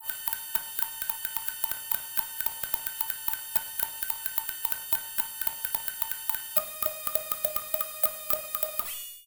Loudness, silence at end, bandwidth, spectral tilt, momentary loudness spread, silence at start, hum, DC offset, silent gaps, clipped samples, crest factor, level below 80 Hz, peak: -29 LUFS; 0.05 s; 18.5 kHz; 0 dB/octave; 4 LU; 0 s; none; under 0.1%; none; under 0.1%; 28 dB; -62 dBFS; -4 dBFS